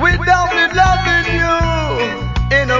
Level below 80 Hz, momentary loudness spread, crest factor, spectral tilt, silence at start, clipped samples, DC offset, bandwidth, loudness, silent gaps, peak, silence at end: -24 dBFS; 7 LU; 14 dB; -5 dB/octave; 0 s; under 0.1%; under 0.1%; 7.6 kHz; -14 LUFS; none; 0 dBFS; 0 s